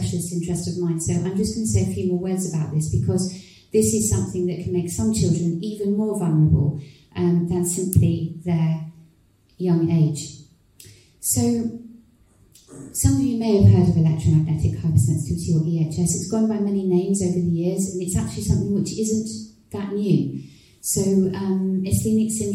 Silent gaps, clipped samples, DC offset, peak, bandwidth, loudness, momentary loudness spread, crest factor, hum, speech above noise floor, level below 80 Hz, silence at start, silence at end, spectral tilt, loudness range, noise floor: none; under 0.1%; under 0.1%; -2 dBFS; 16 kHz; -22 LUFS; 9 LU; 20 dB; none; 37 dB; -42 dBFS; 0 s; 0 s; -6.5 dB/octave; 5 LU; -58 dBFS